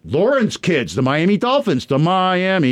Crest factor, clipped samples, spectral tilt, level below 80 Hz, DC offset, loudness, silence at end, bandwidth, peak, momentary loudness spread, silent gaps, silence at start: 10 dB; under 0.1%; -6 dB/octave; -54 dBFS; under 0.1%; -17 LUFS; 0 s; 13 kHz; -6 dBFS; 3 LU; none; 0.05 s